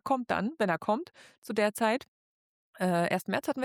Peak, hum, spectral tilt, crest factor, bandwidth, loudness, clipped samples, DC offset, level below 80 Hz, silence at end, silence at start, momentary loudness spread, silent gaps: -14 dBFS; none; -5.5 dB/octave; 16 dB; 19 kHz; -30 LUFS; under 0.1%; under 0.1%; -72 dBFS; 0 s; 0.05 s; 7 LU; 1.38-1.42 s, 2.08-2.73 s